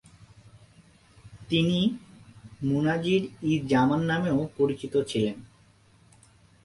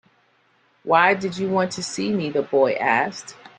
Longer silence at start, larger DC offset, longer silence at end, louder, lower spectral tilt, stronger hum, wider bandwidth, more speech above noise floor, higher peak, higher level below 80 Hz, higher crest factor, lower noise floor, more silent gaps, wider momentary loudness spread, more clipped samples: first, 1.25 s vs 0.85 s; neither; first, 1.2 s vs 0.1 s; second, -26 LUFS vs -21 LUFS; first, -6.5 dB/octave vs -4.5 dB/octave; neither; first, 11.5 kHz vs 9.8 kHz; second, 33 dB vs 41 dB; second, -10 dBFS vs -2 dBFS; first, -58 dBFS vs -64 dBFS; about the same, 18 dB vs 20 dB; about the same, -59 dBFS vs -62 dBFS; neither; second, 6 LU vs 10 LU; neither